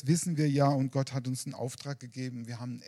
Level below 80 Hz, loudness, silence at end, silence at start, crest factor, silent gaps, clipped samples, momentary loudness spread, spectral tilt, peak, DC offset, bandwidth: -74 dBFS; -32 LUFS; 0 s; 0.05 s; 18 dB; none; under 0.1%; 13 LU; -6 dB/octave; -14 dBFS; under 0.1%; 13.5 kHz